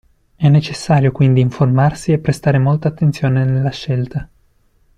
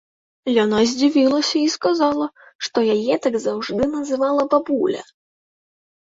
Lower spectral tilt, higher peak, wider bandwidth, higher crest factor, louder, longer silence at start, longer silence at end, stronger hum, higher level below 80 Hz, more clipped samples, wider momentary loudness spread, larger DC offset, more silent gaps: first, -7.5 dB/octave vs -4 dB/octave; about the same, -2 dBFS vs -4 dBFS; first, 10 kHz vs 7.8 kHz; about the same, 12 dB vs 16 dB; first, -15 LUFS vs -19 LUFS; about the same, 0.4 s vs 0.45 s; second, 0.75 s vs 1.1 s; neither; first, -42 dBFS vs -56 dBFS; neither; about the same, 7 LU vs 8 LU; neither; second, none vs 2.55-2.59 s